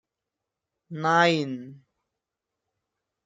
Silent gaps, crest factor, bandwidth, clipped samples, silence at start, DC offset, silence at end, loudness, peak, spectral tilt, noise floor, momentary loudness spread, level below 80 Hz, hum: none; 22 dB; 9.2 kHz; under 0.1%; 0.9 s; under 0.1%; 1.5 s; -23 LUFS; -8 dBFS; -5 dB/octave; -86 dBFS; 18 LU; -78 dBFS; none